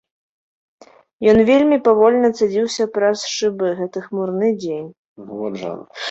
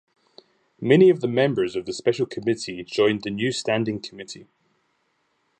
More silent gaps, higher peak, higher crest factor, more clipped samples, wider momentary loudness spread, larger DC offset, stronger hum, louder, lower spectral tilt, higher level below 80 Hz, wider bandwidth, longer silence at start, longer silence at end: first, 4.97-5.16 s vs none; about the same, -2 dBFS vs -4 dBFS; about the same, 16 dB vs 20 dB; neither; about the same, 15 LU vs 17 LU; neither; neither; first, -17 LUFS vs -22 LUFS; about the same, -5 dB/octave vs -5.5 dB/octave; first, -54 dBFS vs -64 dBFS; about the same, 8.2 kHz vs 9 kHz; first, 1.2 s vs 0.8 s; second, 0 s vs 1.15 s